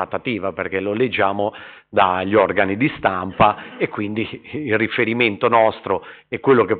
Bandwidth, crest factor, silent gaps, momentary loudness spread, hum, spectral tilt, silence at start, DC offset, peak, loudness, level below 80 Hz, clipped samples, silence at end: 4.6 kHz; 16 dB; none; 9 LU; none; -4 dB/octave; 0 s; under 0.1%; -2 dBFS; -19 LUFS; -52 dBFS; under 0.1%; 0 s